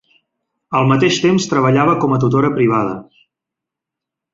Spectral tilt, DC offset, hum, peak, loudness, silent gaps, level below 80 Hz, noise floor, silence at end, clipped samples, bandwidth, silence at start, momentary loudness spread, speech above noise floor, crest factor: -6 dB/octave; under 0.1%; none; -2 dBFS; -14 LUFS; none; -52 dBFS; -83 dBFS; 1.3 s; under 0.1%; 7.8 kHz; 0.7 s; 7 LU; 69 dB; 16 dB